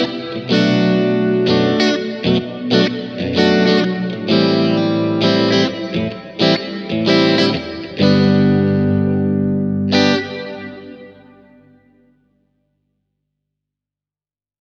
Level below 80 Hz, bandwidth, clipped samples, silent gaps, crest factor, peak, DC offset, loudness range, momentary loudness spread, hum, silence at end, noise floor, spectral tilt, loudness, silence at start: -54 dBFS; 7.2 kHz; under 0.1%; none; 16 dB; 0 dBFS; under 0.1%; 6 LU; 10 LU; 50 Hz at -45 dBFS; 3.65 s; under -90 dBFS; -6.5 dB/octave; -16 LUFS; 0 s